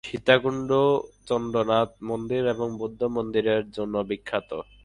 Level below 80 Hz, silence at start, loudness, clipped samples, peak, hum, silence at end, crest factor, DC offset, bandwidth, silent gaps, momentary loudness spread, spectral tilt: -56 dBFS; 0.05 s; -25 LUFS; under 0.1%; -4 dBFS; none; 0.2 s; 22 dB; under 0.1%; 10.5 kHz; none; 9 LU; -6 dB/octave